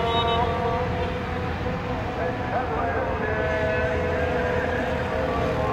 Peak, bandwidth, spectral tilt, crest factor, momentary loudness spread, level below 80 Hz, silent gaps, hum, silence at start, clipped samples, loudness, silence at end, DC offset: -10 dBFS; 13 kHz; -6.5 dB/octave; 14 dB; 5 LU; -36 dBFS; none; none; 0 s; under 0.1%; -25 LUFS; 0 s; under 0.1%